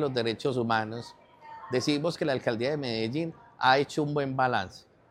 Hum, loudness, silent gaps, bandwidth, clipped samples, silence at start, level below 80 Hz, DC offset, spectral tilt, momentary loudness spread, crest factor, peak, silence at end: none; -28 LUFS; none; 14 kHz; under 0.1%; 0 s; -66 dBFS; under 0.1%; -5.5 dB/octave; 15 LU; 20 dB; -8 dBFS; 0.3 s